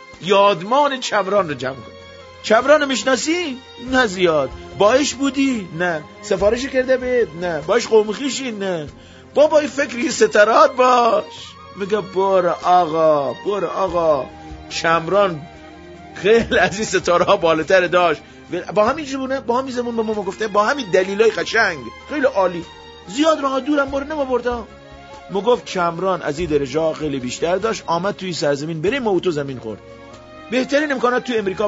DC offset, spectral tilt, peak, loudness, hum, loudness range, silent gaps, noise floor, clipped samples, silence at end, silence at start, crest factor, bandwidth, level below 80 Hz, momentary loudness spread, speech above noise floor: under 0.1%; -4 dB/octave; 0 dBFS; -18 LUFS; none; 5 LU; none; -39 dBFS; under 0.1%; 0 s; 0 s; 18 dB; 8 kHz; -46 dBFS; 13 LU; 21 dB